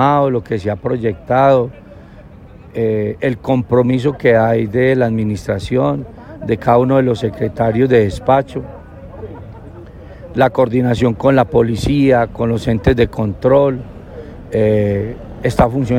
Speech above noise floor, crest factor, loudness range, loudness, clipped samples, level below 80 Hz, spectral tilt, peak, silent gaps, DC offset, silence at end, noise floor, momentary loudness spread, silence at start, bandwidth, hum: 23 dB; 14 dB; 3 LU; -15 LUFS; under 0.1%; -36 dBFS; -8 dB/octave; 0 dBFS; none; under 0.1%; 0 s; -37 dBFS; 20 LU; 0 s; 15 kHz; none